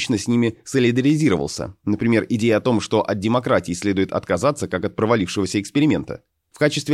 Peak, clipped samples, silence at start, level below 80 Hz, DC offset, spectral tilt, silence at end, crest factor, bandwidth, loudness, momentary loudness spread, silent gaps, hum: -4 dBFS; under 0.1%; 0 s; -52 dBFS; under 0.1%; -5.5 dB/octave; 0 s; 16 dB; 13 kHz; -20 LUFS; 7 LU; none; none